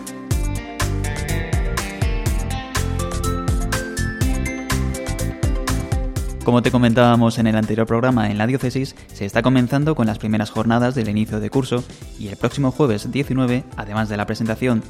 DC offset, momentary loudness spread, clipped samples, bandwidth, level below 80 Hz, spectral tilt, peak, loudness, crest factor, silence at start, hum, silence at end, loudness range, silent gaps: under 0.1%; 8 LU; under 0.1%; 16.5 kHz; -28 dBFS; -6 dB/octave; 0 dBFS; -20 LUFS; 18 dB; 0 s; none; 0 s; 5 LU; none